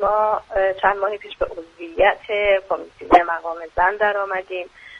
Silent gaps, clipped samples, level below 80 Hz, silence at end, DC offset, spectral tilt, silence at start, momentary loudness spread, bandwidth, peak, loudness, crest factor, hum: none; under 0.1%; -44 dBFS; 0 s; under 0.1%; -5 dB/octave; 0 s; 11 LU; 7 kHz; 0 dBFS; -20 LUFS; 20 dB; none